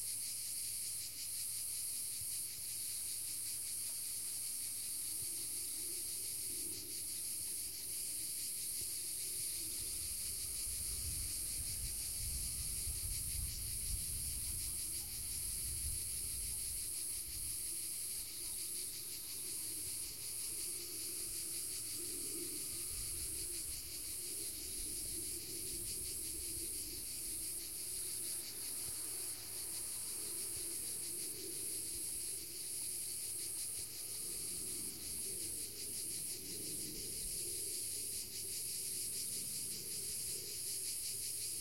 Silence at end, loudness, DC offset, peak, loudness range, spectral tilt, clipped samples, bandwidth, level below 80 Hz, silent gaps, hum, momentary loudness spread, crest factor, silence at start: 0 s; -40 LUFS; 0.1%; -28 dBFS; 2 LU; -0.5 dB/octave; under 0.1%; 16.5 kHz; -58 dBFS; none; none; 2 LU; 16 dB; 0 s